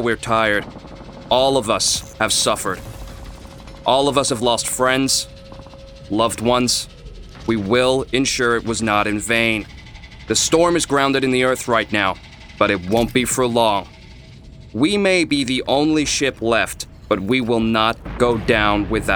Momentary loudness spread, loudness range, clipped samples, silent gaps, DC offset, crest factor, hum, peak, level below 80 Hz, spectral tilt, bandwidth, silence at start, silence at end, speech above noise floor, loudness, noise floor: 16 LU; 2 LU; under 0.1%; none; under 0.1%; 18 dB; none; 0 dBFS; -40 dBFS; -3.5 dB/octave; over 20 kHz; 0 s; 0 s; 22 dB; -18 LUFS; -40 dBFS